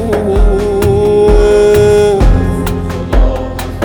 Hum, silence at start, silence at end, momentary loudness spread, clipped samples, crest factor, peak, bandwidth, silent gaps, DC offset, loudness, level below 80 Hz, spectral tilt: none; 0 s; 0 s; 9 LU; under 0.1%; 8 dB; 0 dBFS; 20 kHz; none; under 0.1%; -10 LUFS; -14 dBFS; -7 dB/octave